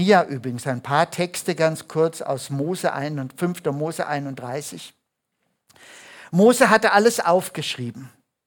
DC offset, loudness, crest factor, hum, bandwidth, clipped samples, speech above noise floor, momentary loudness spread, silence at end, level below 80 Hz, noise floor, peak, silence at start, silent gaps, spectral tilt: under 0.1%; -21 LUFS; 20 dB; none; 19 kHz; under 0.1%; 54 dB; 15 LU; 0.4 s; -68 dBFS; -75 dBFS; -2 dBFS; 0 s; none; -5 dB/octave